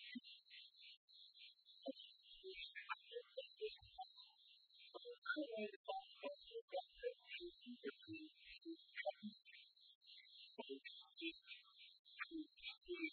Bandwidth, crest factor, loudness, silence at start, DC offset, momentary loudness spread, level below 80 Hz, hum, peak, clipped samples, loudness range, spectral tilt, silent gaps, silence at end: 4.5 kHz; 22 dB; -54 LUFS; 0 s; under 0.1%; 14 LU; -86 dBFS; none; -32 dBFS; under 0.1%; 4 LU; -0.5 dB/octave; 0.97-1.08 s, 5.18-5.22 s, 5.76-5.84 s, 6.62-6.68 s, 9.95-10.01 s, 11.99-12.05 s; 0 s